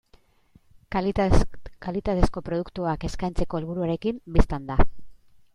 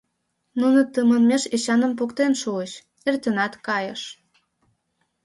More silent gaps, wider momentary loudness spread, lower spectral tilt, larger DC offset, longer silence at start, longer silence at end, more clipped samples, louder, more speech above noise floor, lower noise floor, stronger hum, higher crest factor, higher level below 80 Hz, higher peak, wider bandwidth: neither; second, 7 LU vs 13 LU; first, -7.5 dB/octave vs -4 dB/octave; neither; first, 0.9 s vs 0.55 s; second, 0.4 s vs 1.1 s; neither; second, -27 LUFS vs -22 LUFS; second, 37 dB vs 53 dB; second, -59 dBFS vs -74 dBFS; neither; about the same, 20 dB vs 16 dB; first, -30 dBFS vs -70 dBFS; first, -2 dBFS vs -8 dBFS; about the same, 10.5 kHz vs 11.5 kHz